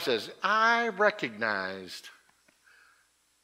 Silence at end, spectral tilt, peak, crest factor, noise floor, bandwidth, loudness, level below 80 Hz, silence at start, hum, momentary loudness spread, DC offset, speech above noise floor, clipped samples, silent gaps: 1.35 s; -3.5 dB/octave; -10 dBFS; 22 dB; -68 dBFS; 16 kHz; -27 LUFS; -82 dBFS; 0 s; none; 17 LU; under 0.1%; 40 dB; under 0.1%; none